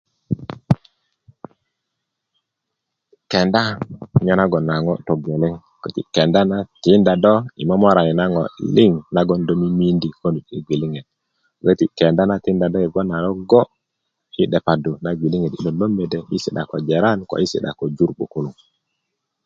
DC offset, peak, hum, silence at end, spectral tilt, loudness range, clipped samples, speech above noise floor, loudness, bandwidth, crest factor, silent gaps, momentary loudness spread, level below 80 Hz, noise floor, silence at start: under 0.1%; 0 dBFS; none; 0.95 s; -7.5 dB/octave; 6 LU; under 0.1%; 62 dB; -18 LUFS; 7.6 kHz; 18 dB; none; 11 LU; -48 dBFS; -79 dBFS; 0.3 s